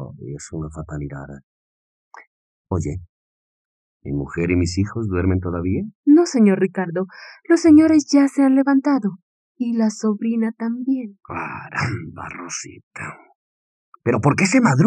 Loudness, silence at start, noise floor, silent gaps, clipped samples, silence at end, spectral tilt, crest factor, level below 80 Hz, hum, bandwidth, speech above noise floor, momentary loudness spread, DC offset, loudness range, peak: -19 LUFS; 0 s; under -90 dBFS; 1.43-2.11 s, 2.27-2.65 s, 3.09-4.00 s, 5.95-6.03 s, 9.22-9.55 s, 12.83-12.91 s, 13.35-13.92 s; under 0.1%; 0 s; -6.5 dB/octave; 18 dB; -50 dBFS; none; 10 kHz; over 71 dB; 18 LU; under 0.1%; 15 LU; -2 dBFS